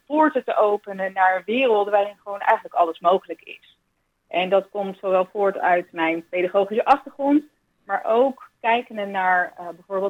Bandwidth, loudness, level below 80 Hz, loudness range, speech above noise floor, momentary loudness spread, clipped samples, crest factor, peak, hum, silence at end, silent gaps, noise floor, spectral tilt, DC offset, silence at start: 9.4 kHz; -21 LUFS; -72 dBFS; 2 LU; 50 dB; 9 LU; under 0.1%; 18 dB; -4 dBFS; none; 0 s; none; -71 dBFS; -6.5 dB/octave; under 0.1%; 0.1 s